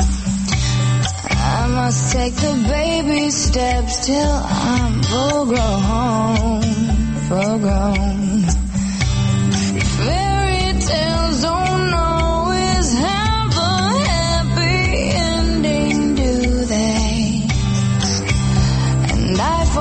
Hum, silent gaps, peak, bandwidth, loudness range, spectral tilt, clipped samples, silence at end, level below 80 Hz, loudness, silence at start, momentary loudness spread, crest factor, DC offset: none; none; -4 dBFS; 8.8 kHz; 1 LU; -5 dB/octave; under 0.1%; 0 s; -24 dBFS; -17 LUFS; 0 s; 2 LU; 12 dB; under 0.1%